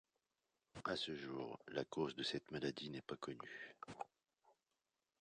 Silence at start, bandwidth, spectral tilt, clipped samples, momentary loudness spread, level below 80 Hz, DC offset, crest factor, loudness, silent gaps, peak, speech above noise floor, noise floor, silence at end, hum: 0.75 s; 10 kHz; -4.5 dB/octave; under 0.1%; 11 LU; -78 dBFS; under 0.1%; 22 dB; -47 LUFS; none; -26 dBFS; over 43 dB; under -90 dBFS; 0.7 s; none